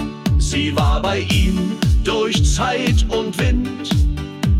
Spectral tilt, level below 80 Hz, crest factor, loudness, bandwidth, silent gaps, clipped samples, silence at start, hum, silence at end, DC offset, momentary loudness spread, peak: -5.5 dB/octave; -22 dBFS; 10 dB; -18 LUFS; 15.5 kHz; none; under 0.1%; 0 s; none; 0 s; under 0.1%; 4 LU; -6 dBFS